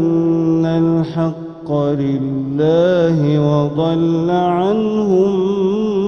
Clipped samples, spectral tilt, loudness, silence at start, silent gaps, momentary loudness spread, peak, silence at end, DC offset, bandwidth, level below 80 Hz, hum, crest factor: under 0.1%; -9 dB/octave; -16 LUFS; 0 s; none; 6 LU; -4 dBFS; 0 s; under 0.1%; 6.6 kHz; -48 dBFS; none; 12 dB